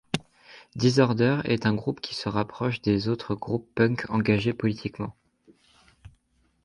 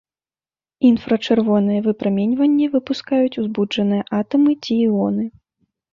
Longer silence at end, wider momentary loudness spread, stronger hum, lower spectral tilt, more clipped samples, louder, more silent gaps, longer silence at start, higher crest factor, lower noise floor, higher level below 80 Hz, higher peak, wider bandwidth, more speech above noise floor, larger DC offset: about the same, 0.55 s vs 0.65 s; first, 12 LU vs 5 LU; neither; about the same, -6.5 dB/octave vs -7.5 dB/octave; neither; second, -26 LUFS vs -18 LUFS; neither; second, 0.15 s vs 0.8 s; first, 20 dB vs 14 dB; second, -68 dBFS vs under -90 dBFS; about the same, -54 dBFS vs -58 dBFS; about the same, -6 dBFS vs -4 dBFS; first, 11.5 kHz vs 7.2 kHz; second, 43 dB vs over 73 dB; neither